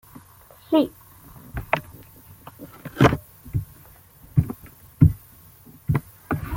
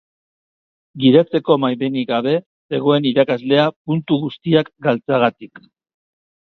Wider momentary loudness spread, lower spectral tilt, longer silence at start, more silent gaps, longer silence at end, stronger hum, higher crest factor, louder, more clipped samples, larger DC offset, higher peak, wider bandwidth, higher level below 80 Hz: first, 24 LU vs 7 LU; second, -7.5 dB/octave vs -9 dB/octave; second, 0.15 s vs 0.95 s; second, none vs 2.46-2.69 s, 3.76-3.85 s; second, 0 s vs 1.05 s; neither; first, 24 dB vs 18 dB; second, -24 LUFS vs -17 LUFS; neither; neither; about the same, -2 dBFS vs 0 dBFS; first, 17 kHz vs 5.8 kHz; first, -40 dBFS vs -62 dBFS